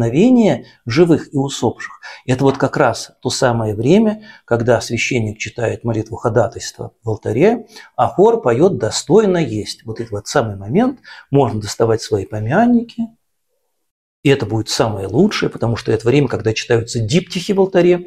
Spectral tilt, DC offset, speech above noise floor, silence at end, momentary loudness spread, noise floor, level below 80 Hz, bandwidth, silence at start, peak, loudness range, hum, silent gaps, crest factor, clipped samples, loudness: -6 dB/octave; under 0.1%; 56 dB; 0 s; 11 LU; -71 dBFS; -44 dBFS; 14.5 kHz; 0 s; 0 dBFS; 3 LU; none; 13.91-14.23 s; 16 dB; under 0.1%; -16 LUFS